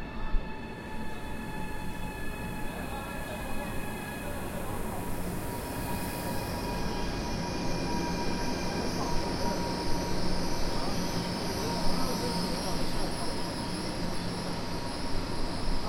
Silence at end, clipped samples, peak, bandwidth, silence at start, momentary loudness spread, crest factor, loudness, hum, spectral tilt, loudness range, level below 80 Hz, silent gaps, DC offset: 0 s; under 0.1%; -14 dBFS; 16.5 kHz; 0 s; 7 LU; 16 dB; -34 LUFS; none; -4.5 dB/octave; 5 LU; -38 dBFS; none; under 0.1%